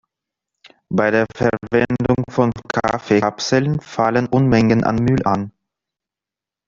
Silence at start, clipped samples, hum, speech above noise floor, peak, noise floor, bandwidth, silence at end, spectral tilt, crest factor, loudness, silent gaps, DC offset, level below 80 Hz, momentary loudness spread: 0.9 s; under 0.1%; none; 71 dB; -2 dBFS; -88 dBFS; 7.6 kHz; 1.2 s; -6.5 dB/octave; 16 dB; -18 LUFS; none; under 0.1%; -46 dBFS; 6 LU